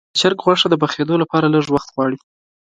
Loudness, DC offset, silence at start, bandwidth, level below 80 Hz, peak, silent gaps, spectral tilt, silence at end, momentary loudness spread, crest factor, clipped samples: -17 LUFS; under 0.1%; 0.15 s; 9.4 kHz; -54 dBFS; 0 dBFS; none; -5 dB/octave; 0.55 s; 7 LU; 16 dB; under 0.1%